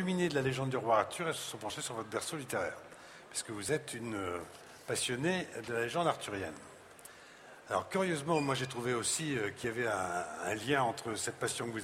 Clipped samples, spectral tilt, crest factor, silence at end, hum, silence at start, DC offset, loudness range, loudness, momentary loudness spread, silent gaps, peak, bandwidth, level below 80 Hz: under 0.1%; -4 dB/octave; 22 dB; 0 s; none; 0 s; under 0.1%; 4 LU; -35 LUFS; 18 LU; none; -14 dBFS; 16 kHz; -70 dBFS